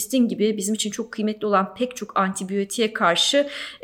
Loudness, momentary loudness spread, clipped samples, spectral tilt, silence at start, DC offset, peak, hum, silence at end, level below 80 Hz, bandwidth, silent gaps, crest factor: -22 LUFS; 9 LU; under 0.1%; -3.5 dB/octave; 0 s; under 0.1%; -6 dBFS; none; 0.05 s; -68 dBFS; 18.5 kHz; none; 16 dB